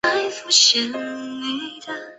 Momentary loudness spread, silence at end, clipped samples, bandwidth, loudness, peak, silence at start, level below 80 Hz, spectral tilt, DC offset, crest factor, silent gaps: 17 LU; 0.05 s; under 0.1%; 8.4 kHz; -18 LUFS; -2 dBFS; 0.05 s; -66 dBFS; 0.5 dB/octave; under 0.1%; 20 dB; none